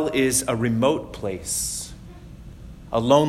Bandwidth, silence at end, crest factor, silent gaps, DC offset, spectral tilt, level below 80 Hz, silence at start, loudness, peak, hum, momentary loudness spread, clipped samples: 16.5 kHz; 0 s; 20 dB; none; under 0.1%; -4 dB/octave; -44 dBFS; 0 s; -23 LUFS; -4 dBFS; none; 23 LU; under 0.1%